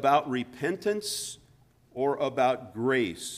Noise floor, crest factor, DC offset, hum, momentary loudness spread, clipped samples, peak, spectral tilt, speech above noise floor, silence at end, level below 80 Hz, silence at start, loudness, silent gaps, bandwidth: -61 dBFS; 20 dB; under 0.1%; none; 9 LU; under 0.1%; -10 dBFS; -4 dB/octave; 33 dB; 0 s; -66 dBFS; 0 s; -29 LUFS; none; 15.5 kHz